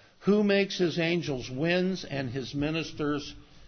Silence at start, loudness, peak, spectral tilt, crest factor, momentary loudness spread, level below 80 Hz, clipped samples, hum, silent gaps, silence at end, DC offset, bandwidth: 0.2 s; -29 LUFS; -12 dBFS; -6 dB/octave; 16 dB; 9 LU; -56 dBFS; under 0.1%; none; none; 0 s; under 0.1%; 6.6 kHz